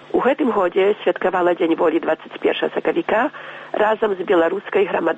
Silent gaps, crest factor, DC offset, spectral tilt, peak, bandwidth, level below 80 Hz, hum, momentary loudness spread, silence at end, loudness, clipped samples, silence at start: none; 12 dB; under 0.1%; -7 dB/octave; -6 dBFS; 8 kHz; -60 dBFS; none; 4 LU; 0 s; -19 LUFS; under 0.1%; 0 s